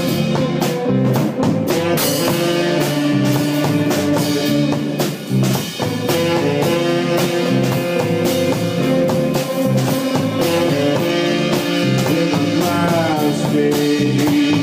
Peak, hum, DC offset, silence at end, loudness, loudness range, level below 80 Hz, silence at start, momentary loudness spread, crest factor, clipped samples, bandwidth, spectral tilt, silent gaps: -4 dBFS; none; under 0.1%; 0 s; -17 LUFS; 1 LU; -52 dBFS; 0 s; 2 LU; 12 dB; under 0.1%; 16 kHz; -5.5 dB/octave; none